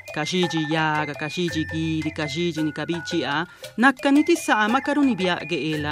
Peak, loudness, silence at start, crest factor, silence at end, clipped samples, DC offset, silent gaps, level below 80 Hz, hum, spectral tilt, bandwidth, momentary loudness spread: -4 dBFS; -23 LUFS; 0.05 s; 20 dB; 0 s; under 0.1%; under 0.1%; none; -62 dBFS; none; -5 dB/octave; 15.5 kHz; 7 LU